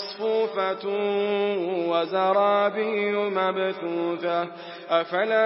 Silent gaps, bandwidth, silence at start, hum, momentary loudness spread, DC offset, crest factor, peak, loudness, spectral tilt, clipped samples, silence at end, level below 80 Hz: none; 5.8 kHz; 0 s; none; 6 LU; under 0.1%; 16 dB; -8 dBFS; -25 LUFS; -9 dB/octave; under 0.1%; 0 s; -86 dBFS